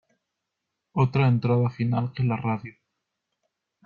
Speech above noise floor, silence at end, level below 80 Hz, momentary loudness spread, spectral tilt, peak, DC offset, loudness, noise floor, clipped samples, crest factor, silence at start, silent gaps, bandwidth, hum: 59 dB; 1.15 s; -60 dBFS; 11 LU; -10 dB/octave; -8 dBFS; under 0.1%; -25 LUFS; -82 dBFS; under 0.1%; 18 dB; 0.95 s; none; 4.9 kHz; none